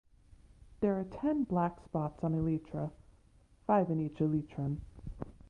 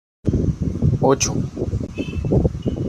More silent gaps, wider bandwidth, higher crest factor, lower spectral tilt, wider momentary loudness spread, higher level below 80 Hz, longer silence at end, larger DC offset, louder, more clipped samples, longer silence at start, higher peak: neither; second, 5.4 kHz vs 14 kHz; about the same, 20 dB vs 18 dB; first, -10.5 dB/octave vs -6 dB/octave; first, 12 LU vs 8 LU; second, -56 dBFS vs -32 dBFS; first, 0.2 s vs 0 s; neither; second, -34 LUFS vs -21 LUFS; neither; first, 0.6 s vs 0.25 s; second, -16 dBFS vs -4 dBFS